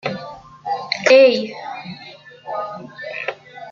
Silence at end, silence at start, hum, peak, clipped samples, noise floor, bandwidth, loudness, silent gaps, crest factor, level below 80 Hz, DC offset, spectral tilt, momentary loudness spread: 0 s; 0.05 s; none; -2 dBFS; under 0.1%; -41 dBFS; 7.6 kHz; -17 LUFS; none; 18 dB; -64 dBFS; under 0.1%; -4 dB/octave; 25 LU